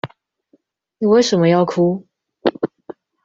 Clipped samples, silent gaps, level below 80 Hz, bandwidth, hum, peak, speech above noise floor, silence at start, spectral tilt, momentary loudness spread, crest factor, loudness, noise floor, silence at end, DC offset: under 0.1%; none; -60 dBFS; 7.6 kHz; none; -2 dBFS; 46 dB; 0.05 s; -6 dB/octave; 13 LU; 16 dB; -17 LUFS; -60 dBFS; 0.6 s; under 0.1%